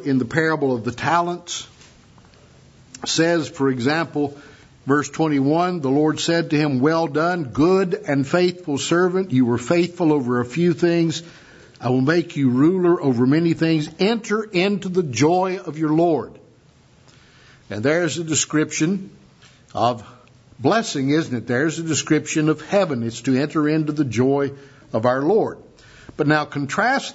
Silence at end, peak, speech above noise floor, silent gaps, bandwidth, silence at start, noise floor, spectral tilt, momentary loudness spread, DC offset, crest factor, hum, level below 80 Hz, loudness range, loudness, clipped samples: 0 s; -2 dBFS; 33 dB; none; 8 kHz; 0 s; -52 dBFS; -5.5 dB/octave; 7 LU; under 0.1%; 18 dB; none; -58 dBFS; 4 LU; -20 LUFS; under 0.1%